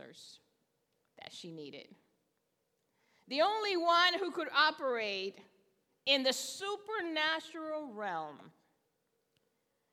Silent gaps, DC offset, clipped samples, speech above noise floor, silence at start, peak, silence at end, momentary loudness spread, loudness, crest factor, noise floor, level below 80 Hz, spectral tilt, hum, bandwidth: none; under 0.1%; under 0.1%; 47 dB; 0 s; -14 dBFS; 1.45 s; 19 LU; -33 LUFS; 24 dB; -81 dBFS; under -90 dBFS; -1.5 dB/octave; none; 17.5 kHz